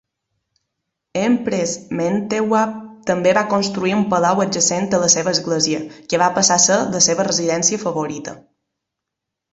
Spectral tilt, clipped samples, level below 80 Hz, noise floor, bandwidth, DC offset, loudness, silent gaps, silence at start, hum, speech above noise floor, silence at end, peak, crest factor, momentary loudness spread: -3 dB/octave; under 0.1%; -58 dBFS; -82 dBFS; 8.4 kHz; under 0.1%; -17 LUFS; none; 1.15 s; none; 64 dB; 1.15 s; 0 dBFS; 18 dB; 9 LU